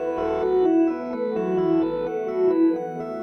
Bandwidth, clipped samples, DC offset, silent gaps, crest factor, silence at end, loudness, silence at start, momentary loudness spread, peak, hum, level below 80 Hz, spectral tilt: 6.2 kHz; under 0.1%; under 0.1%; none; 12 dB; 0 s; -23 LUFS; 0 s; 7 LU; -10 dBFS; none; -54 dBFS; -8.5 dB/octave